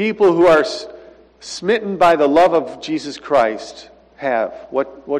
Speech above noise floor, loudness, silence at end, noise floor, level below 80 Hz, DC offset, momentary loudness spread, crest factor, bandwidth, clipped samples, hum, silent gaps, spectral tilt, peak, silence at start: 26 dB; -16 LUFS; 0 s; -42 dBFS; -54 dBFS; under 0.1%; 17 LU; 12 dB; 11.5 kHz; under 0.1%; none; none; -5 dB/octave; -4 dBFS; 0 s